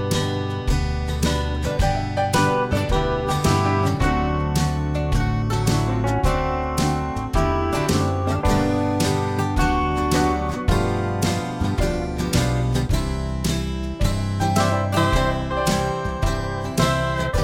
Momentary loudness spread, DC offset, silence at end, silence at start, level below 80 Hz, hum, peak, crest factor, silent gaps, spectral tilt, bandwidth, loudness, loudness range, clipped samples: 5 LU; under 0.1%; 0 s; 0 s; -28 dBFS; none; -4 dBFS; 16 dB; none; -5.5 dB/octave; 17 kHz; -22 LUFS; 2 LU; under 0.1%